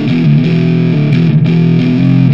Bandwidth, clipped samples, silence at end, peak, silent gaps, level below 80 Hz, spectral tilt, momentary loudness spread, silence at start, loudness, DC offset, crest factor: 5.8 kHz; under 0.1%; 0 s; 0 dBFS; none; -46 dBFS; -9.5 dB/octave; 1 LU; 0 s; -10 LUFS; 2%; 8 dB